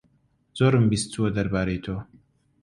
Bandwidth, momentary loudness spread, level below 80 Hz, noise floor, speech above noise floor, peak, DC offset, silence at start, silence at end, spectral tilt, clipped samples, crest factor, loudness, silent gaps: 11.5 kHz; 15 LU; -46 dBFS; -65 dBFS; 42 dB; -8 dBFS; under 0.1%; 0.55 s; 0.6 s; -6 dB/octave; under 0.1%; 18 dB; -24 LUFS; none